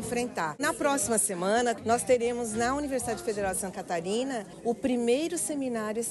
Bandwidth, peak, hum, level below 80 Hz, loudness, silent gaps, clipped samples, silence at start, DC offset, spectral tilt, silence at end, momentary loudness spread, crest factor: 12.5 kHz; -14 dBFS; none; -56 dBFS; -29 LUFS; none; under 0.1%; 0 s; under 0.1%; -3.5 dB/octave; 0 s; 7 LU; 16 dB